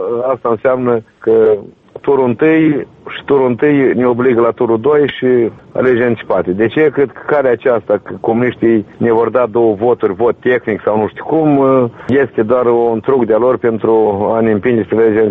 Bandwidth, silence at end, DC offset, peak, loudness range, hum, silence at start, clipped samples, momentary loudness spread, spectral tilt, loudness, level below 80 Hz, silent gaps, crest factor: 4 kHz; 0 s; under 0.1%; -2 dBFS; 1 LU; none; 0 s; under 0.1%; 5 LU; -10 dB/octave; -13 LUFS; -50 dBFS; none; 10 dB